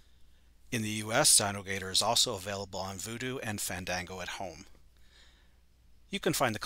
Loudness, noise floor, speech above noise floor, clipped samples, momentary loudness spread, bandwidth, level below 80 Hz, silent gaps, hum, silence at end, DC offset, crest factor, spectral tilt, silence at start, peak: -30 LUFS; -62 dBFS; 30 dB; under 0.1%; 16 LU; 16 kHz; -60 dBFS; none; none; 0 s; under 0.1%; 24 dB; -2 dB/octave; 0.2 s; -10 dBFS